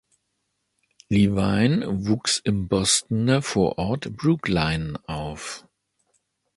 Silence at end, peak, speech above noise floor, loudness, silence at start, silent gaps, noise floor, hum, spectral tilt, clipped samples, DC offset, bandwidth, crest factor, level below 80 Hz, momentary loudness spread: 0.95 s; -6 dBFS; 53 dB; -23 LUFS; 1.1 s; none; -75 dBFS; none; -4.5 dB/octave; under 0.1%; under 0.1%; 11.5 kHz; 18 dB; -44 dBFS; 11 LU